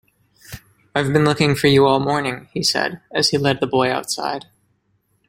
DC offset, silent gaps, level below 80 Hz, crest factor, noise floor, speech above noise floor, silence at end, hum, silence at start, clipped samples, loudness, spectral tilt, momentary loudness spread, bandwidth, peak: under 0.1%; none; -52 dBFS; 20 dB; -65 dBFS; 47 dB; 0.9 s; none; 0.5 s; under 0.1%; -18 LUFS; -4.5 dB/octave; 16 LU; 16.5 kHz; 0 dBFS